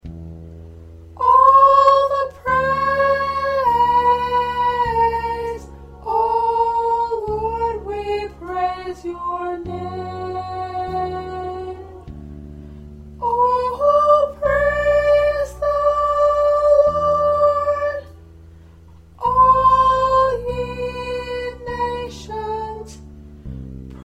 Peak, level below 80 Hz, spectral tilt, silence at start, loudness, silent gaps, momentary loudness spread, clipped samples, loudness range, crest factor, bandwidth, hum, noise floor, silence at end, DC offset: -2 dBFS; -40 dBFS; -6 dB/octave; 0.05 s; -18 LUFS; none; 20 LU; under 0.1%; 11 LU; 16 dB; 12.5 kHz; none; -44 dBFS; 0 s; under 0.1%